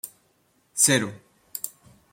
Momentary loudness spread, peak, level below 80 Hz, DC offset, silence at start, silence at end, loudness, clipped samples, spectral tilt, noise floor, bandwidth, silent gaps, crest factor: 19 LU; -2 dBFS; -68 dBFS; under 0.1%; 0.05 s; 0.45 s; -23 LUFS; under 0.1%; -2.5 dB/octave; -66 dBFS; 16.5 kHz; none; 26 dB